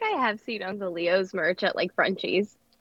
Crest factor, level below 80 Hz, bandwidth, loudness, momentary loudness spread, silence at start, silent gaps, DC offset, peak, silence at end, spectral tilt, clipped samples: 20 dB; -76 dBFS; 7.8 kHz; -27 LUFS; 7 LU; 0 s; none; under 0.1%; -8 dBFS; 0.35 s; -5.5 dB/octave; under 0.1%